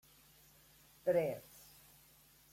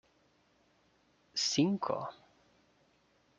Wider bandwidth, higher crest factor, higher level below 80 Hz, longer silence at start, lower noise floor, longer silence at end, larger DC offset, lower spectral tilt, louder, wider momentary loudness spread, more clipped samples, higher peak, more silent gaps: first, 16.5 kHz vs 9.4 kHz; about the same, 20 dB vs 22 dB; about the same, -76 dBFS vs -78 dBFS; second, 1.05 s vs 1.35 s; second, -66 dBFS vs -71 dBFS; about the same, 1.15 s vs 1.25 s; neither; first, -6 dB/octave vs -4 dB/octave; second, -38 LUFS vs -33 LUFS; first, 26 LU vs 11 LU; neither; second, -22 dBFS vs -16 dBFS; neither